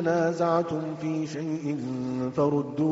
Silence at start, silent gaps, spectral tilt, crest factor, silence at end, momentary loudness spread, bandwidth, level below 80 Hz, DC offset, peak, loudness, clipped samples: 0 s; none; -7 dB/octave; 16 dB; 0 s; 6 LU; 8 kHz; -64 dBFS; under 0.1%; -10 dBFS; -28 LUFS; under 0.1%